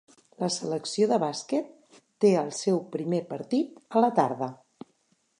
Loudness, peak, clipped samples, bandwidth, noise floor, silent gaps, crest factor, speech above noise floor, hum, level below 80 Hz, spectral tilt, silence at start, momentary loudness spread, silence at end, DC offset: -27 LUFS; -8 dBFS; under 0.1%; 11 kHz; -70 dBFS; none; 20 dB; 44 dB; none; -80 dBFS; -5.5 dB/octave; 0.4 s; 8 LU; 0.85 s; under 0.1%